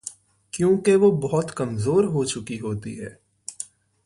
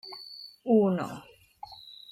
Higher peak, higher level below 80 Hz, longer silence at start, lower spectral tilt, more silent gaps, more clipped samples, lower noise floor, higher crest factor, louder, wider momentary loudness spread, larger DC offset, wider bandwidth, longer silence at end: first, -8 dBFS vs -12 dBFS; first, -56 dBFS vs -72 dBFS; about the same, 0.05 s vs 0.05 s; second, -6 dB/octave vs -7.5 dB/octave; neither; neither; second, -42 dBFS vs -49 dBFS; about the same, 16 dB vs 18 dB; first, -22 LUFS vs -27 LUFS; second, 19 LU vs 22 LU; neither; second, 11.5 kHz vs 14 kHz; first, 0.4 s vs 0.2 s